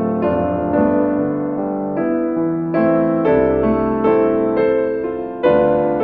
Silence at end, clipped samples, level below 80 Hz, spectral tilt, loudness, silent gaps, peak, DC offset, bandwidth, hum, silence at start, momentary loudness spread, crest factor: 0 s; under 0.1%; -42 dBFS; -11 dB/octave; -17 LUFS; none; -4 dBFS; under 0.1%; 4.7 kHz; none; 0 s; 6 LU; 14 dB